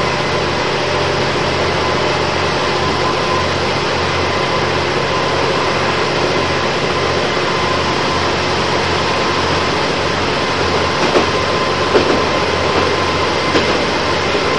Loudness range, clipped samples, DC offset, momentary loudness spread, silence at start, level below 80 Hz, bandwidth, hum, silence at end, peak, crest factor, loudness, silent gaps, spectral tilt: 1 LU; under 0.1%; 2%; 2 LU; 0 s; -38 dBFS; 10.5 kHz; none; 0 s; 0 dBFS; 14 dB; -15 LUFS; none; -4 dB/octave